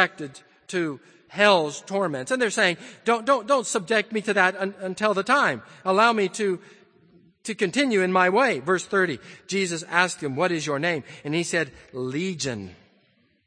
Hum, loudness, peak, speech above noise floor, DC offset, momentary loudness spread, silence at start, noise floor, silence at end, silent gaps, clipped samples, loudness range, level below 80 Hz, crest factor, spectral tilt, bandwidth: none; -23 LUFS; -2 dBFS; 40 dB; under 0.1%; 12 LU; 0 s; -64 dBFS; 0.7 s; none; under 0.1%; 3 LU; -70 dBFS; 22 dB; -4 dB/octave; 9.8 kHz